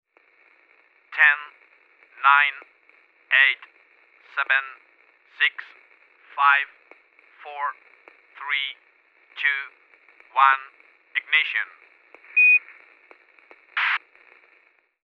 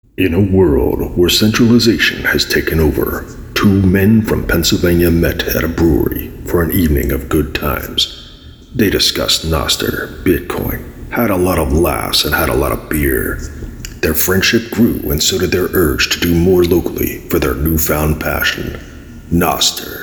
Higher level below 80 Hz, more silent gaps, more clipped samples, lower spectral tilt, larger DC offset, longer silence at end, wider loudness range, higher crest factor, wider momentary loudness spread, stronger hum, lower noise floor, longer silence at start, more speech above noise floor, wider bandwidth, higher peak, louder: second, under -90 dBFS vs -26 dBFS; neither; neither; second, 1.5 dB/octave vs -4.5 dB/octave; neither; first, 1.1 s vs 0 s; about the same, 5 LU vs 3 LU; first, 24 dB vs 14 dB; first, 20 LU vs 9 LU; neither; first, -61 dBFS vs -36 dBFS; first, 1.1 s vs 0.2 s; first, 38 dB vs 23 dB; second, 6.2 kHz vs over 20 kHz; about the same, -2 dBFS vs 0 dBFS; second, -21 LUFS vs -14 LUFS